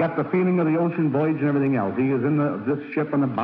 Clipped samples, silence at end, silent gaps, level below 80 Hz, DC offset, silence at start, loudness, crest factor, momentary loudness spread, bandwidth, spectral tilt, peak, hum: under 0.1%; 0 s; none; -66 dBFS; under 0.1%; 0 s; -22 LUFS; 12 dB; 4 LU; 4.8 kHz; -11.5 dB/octave; -10 dBFS; none